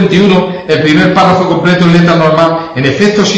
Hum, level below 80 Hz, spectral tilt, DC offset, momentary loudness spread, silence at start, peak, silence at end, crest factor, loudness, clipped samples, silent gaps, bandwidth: none; -38 dBFS; -6 dB/octave; under 0.1%; 5 LU; 0 s; 0 dBFS; 0 s; 8 dB; -8 LUFS; 1%; none; 8.2 kHz